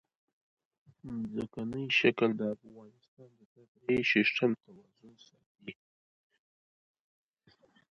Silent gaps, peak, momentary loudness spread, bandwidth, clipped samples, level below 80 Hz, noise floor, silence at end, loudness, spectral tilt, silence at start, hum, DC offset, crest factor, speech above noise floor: 3.08-3.17 s, 3.45-3.56 s, 3.68-3.75 s, 5.46-5.55 s; -12 dBFS; 22 LU; 7.2 kHz; under 0.1%; -70 dBFS; -68 dBFS; 2.2 s; -31 LUFS; -6 dB/octave; 1.05 s; none; under 0.1%; 24 dB; 34 dB